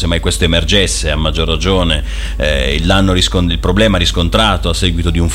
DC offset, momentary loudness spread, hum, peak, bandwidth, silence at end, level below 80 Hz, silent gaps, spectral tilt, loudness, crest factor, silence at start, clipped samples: under 0.1%; 4 LU; none; 0 dBFS; 16 kHz; 0 s; -18 dBFS; none; -4.5 dB/octave; -13 LUFS; 12 dB; 0 s; under 0.1%